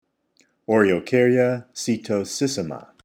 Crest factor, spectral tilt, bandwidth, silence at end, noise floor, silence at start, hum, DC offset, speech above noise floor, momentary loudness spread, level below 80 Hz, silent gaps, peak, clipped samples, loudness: 18 dB; -5 dB/octave; 16.5 kHz; 0.25 s; -64 dBFS; 0.7 s; none; under 0.1%; 43 dB; 10 LU; -64 dBFS; none; -4 dBFS; under 0.1%; -21 LUFS